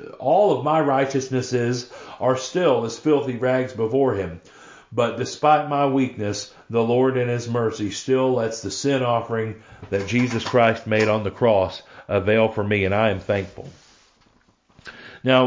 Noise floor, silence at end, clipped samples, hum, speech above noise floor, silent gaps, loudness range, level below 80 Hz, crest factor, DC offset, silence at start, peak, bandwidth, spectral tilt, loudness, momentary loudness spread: -60 dBFS; 0 s; under 0.1%; none; 39 dB; none; 3 LU; -50 dBFS; 18 dB; under 0.1%; 0 s; -4 dBFS; 7.6 kHz; -5.5 dB/octave; -21 LUFS; 11 LU